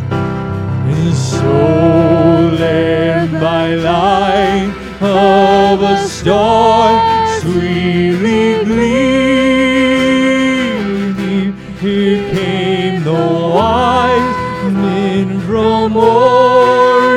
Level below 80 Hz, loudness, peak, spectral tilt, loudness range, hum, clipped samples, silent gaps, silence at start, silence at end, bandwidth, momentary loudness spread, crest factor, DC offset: -36 dBFS; -12 LUFS; 0 dBFS; -6.5 dB/octave; 3 LU; none; under 0.1%; none; 0 s; 0 s; 12.5 kHz; 8 LU; 12 dB; under 0.1%